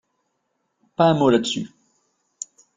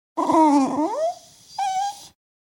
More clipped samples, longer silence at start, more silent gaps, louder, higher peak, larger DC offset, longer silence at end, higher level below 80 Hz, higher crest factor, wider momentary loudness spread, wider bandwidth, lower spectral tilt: neither; first, 1 s vs 0.15 s; neither; about the same, -19 LUFS vs -21 LUFS; first, -2 dBFS vs -6 dBFS; neither; first, 1.1 s vs 0.5 s; first, -60 dBFS vs -68 dBFS; about the same, 20 dB vs 16 dB; about the same, 20 LU vs 21 LU; second, 9.6 kHz vs 17 kHz; about the same, -5.5 dB/octave vs -4.5 dB/octave